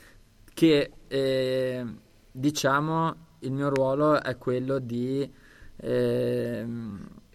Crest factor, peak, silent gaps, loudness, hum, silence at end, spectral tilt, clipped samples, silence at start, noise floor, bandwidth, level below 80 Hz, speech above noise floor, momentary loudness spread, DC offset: 18 dB; -10 dBFS; none; -27 LUFS; none; 0.15 s; -6 dB/octave; under 0.1%; 0.55 s; -54 dBFS; 15 kHz; -56 dBFS; 28 dB; 15 LU; under 0.1%